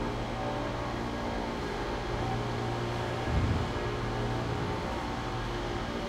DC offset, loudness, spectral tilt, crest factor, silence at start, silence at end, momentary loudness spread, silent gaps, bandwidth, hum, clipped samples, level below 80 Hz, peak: under 0.1%; -33 LUFS; -6 dB/octave; 16 dB; 0 s; 0 s; 4 LU; none; 13.5 kHz; none; under 0.1%; -42 dBFS; -16 dBFS